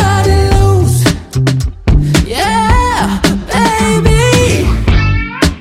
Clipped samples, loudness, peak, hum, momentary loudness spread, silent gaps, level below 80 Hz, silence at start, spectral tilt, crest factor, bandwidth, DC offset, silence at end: under 0.1%; -11 LUFS; 0 dBFS; none; 4 LU; none; -16 dBFS; 0 s; -5.5 dB/octave; 10 dB; 16 kHz; under 0.1%; 0 s